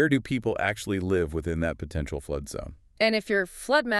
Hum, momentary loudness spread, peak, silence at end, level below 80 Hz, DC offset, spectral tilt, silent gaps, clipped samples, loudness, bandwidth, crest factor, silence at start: none; 9 LU; -8 dBFS; 0 s; -44 dBFS; under 0.1%; -5.5 dB/octave; none; under 0.1%; -28 LUFS; 13.5 kHz; 18 dB; 0 s